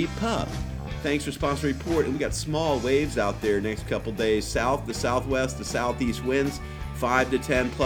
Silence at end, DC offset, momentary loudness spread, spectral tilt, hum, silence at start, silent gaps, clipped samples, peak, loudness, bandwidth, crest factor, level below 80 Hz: 0 s; under 0.1%; 6 LU; -5 dB/octave; none; 0 s; none; under 0.1%; -6 dBFS; -26 LUFS; 19 kHz; 20 dB; -38 dBFS